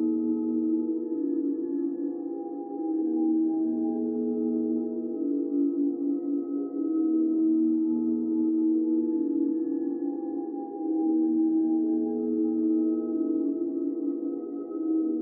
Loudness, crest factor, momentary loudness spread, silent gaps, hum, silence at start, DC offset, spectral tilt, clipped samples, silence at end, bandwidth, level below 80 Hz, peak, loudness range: -28 LUFS; 10 dB; 8 LU; none; none; 0 s; under 0.1%; -9 dB/octave; under 0.1%; 0 s; 1.7 kHz; under -90 dBFS; -18 dBFS; 3 LU